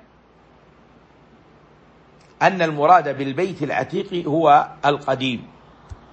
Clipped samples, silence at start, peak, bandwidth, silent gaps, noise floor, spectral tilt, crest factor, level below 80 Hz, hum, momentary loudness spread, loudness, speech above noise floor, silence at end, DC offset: under 0.1%; 2.4 s; -2 dBFS; 8.2 kHz; none; -52 dBFS; -6 dB/octave; 20 dB; -56 dBFS; none; 10 LU; -19 LUFS; 34 dB; 0.2 s; under 0.1%